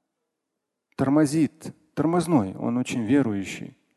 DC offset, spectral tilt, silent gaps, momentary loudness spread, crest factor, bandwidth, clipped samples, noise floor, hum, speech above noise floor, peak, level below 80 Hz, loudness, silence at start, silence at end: under 0.1%; -6.5 dB/octave; none; 15 LU; 18 dB; 12.5 kHz; under 0.1%; -82 dBFS; none; 59 dB; -8 dBFS; -58 dBFS; -24 LUFS; 1 s; 0.25 s